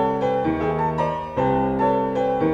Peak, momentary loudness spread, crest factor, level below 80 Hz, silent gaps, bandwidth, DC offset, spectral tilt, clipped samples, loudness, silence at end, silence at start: -10 dBFS; 3 LU; 12 dB; -42 dBFS; none; 7.4 kHz; under 0.1%; -8.5 dB/octave; under 0.1%; -22 LUFS; 0 s; 0 s